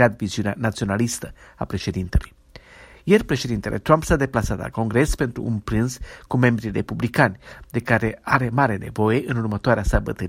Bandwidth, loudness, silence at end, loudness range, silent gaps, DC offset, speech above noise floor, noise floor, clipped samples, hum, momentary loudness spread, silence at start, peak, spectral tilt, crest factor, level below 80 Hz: 16 kHz; -22 LUFS; 0 s; 3 LU; none; under 0.1%; 25 dB; -47 dBFS; under 0.1%; none; 9 LU; 0 s; 0 dBFS; -6 dB/octave; 20 dB; -34 dBFS